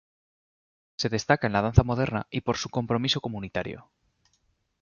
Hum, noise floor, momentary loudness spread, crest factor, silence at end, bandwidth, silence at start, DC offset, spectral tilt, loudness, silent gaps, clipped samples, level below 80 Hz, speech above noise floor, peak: none; -71 dBFS; 11 LU; 24 dB; 1 s; 7.2 kHz; 1 s; under 0.1%; -5.5 dB/octave; -26 LUFS; none; under 0.1%; -42 dBFS; 45 dB; -4 dBFS